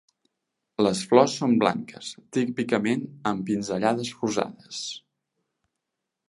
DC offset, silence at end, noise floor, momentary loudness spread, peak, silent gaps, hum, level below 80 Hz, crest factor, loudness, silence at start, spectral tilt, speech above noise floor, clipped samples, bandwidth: under 0.1%; 1.3 s; -84 dBFS; 15 LU; -2 dBFS; none; none; -66 dBFS; 24 dB; -25 LUFS; 0.8 s; -5 dB/octave; 59 dB; under 0.1%; 11.5 kHz